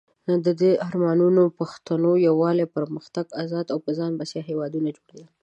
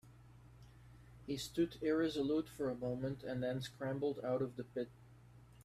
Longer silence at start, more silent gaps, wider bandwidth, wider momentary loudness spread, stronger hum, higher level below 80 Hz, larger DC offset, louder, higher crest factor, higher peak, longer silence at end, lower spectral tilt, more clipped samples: first, 0.25 s vs 0.05 s; neither; second, 8.4 kHz vs 15 kHz; second, 11 LU vs 23 LU; neither; second, -72 dBFS vs -66 dBFS; neither; first, -23 LUFS vs -40 LUFS; about the same, 14 dB vs 16 dB; first, -8 dBFS vs -26 dBFS; first, 0.2 s vs 0 s; first, -8 dB/octave vs -6.5 dB/octave; neither